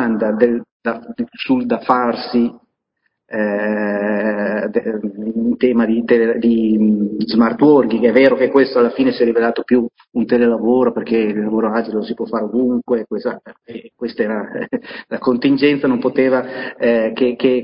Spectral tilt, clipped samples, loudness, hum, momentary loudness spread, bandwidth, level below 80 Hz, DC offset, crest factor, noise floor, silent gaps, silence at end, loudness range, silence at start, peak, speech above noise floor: -9.5 dB/octave; under 0.1%; -16 LUFS; none; 11 LU; 5.4 kHz; -52 dBFS; under 0.1%; 16 dB; -70 dBFS; 0.71-0.80 s; 0 s; 7 LU; 0 s; 0 dBFS; 54 dB